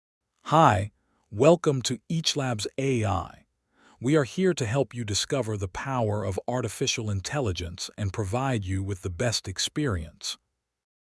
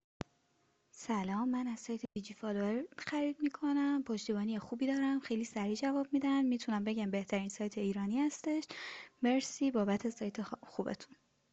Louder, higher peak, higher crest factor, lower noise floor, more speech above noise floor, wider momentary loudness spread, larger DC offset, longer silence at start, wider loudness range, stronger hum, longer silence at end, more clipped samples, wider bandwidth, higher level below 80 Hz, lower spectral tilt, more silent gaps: first, -27 LUFS vs -36 LUFS; first, -4 dBFS vs -22 dBFS; first, 24 dB vs 14 dB; second, -62 dBFS vs -76 dBFS; second, 36 dB vs 40 dB; about the same, 12 LU vs 10 LU; neither; second, 0.45 s vs 0.95 s; first, 5 LU vs 2 LU; neither; first, 0.65 s vs 0.45 s; neither; first, 12 kHz vs 8.2 kHz; first, -54 dBFS vs -74 dBFS; about the same, -5 dB/octave vs -5.5 dB/octave; neither